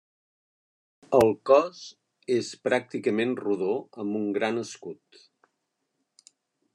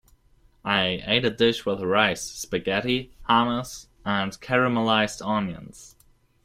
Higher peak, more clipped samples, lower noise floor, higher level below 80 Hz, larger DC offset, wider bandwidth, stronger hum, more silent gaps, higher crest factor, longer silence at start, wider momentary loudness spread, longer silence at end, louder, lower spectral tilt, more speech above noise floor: about the same, -6 dBFS vs -4 dBFS; neither; first, -79 dBFS vs -59 dBFS; second, -66 dBFS vs -52 dBFS; neither; second, 12 kHz vs 16 kHz; neither; neither; about the same, 22 dB vs 20 dB; first, 1.1 s vs 0.65 s; first, 21 LU vs 11 LU; first, 1.8 s vs 0.55 s; about the same, -26 LUFS vs -24 LUFS; first, -5.5 dB/octave vs -4 dB/octave; first, 54 dB vs 35 dB